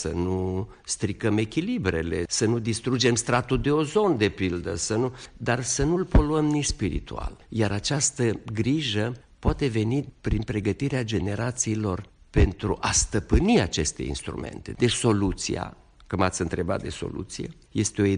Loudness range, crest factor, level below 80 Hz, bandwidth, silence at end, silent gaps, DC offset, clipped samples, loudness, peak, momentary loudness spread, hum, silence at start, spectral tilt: 3 LU; 16 dB; -36 dBFS; 10 kHz; 0 s; none; under 0.1%; under 0.1%; -26 LUFS; -10 dBFS; 10 LU; none; 0 s; -4.5 dB/octave